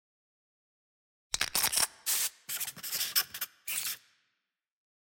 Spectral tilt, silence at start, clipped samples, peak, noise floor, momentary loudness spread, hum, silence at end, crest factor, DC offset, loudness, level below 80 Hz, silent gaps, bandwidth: 1.5 dB/octave; 1.35 s; under 0.1%; -12 dBFS; -85 dBFS; 10 LU; none; 1.2 s; 24 dB; under 0.1%; -31 LUFS; -66 dBFS; none; 17 kHz